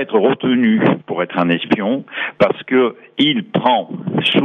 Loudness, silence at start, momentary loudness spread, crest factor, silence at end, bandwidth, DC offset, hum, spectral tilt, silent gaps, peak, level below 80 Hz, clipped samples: -16 LUFS; 0 s; 6 LU; 14 dB; 0 s; 9 kHz; under 0.1%; none; -7.5 dB/octave; none; -2 dBFS; -58 dBFS; under 0.1%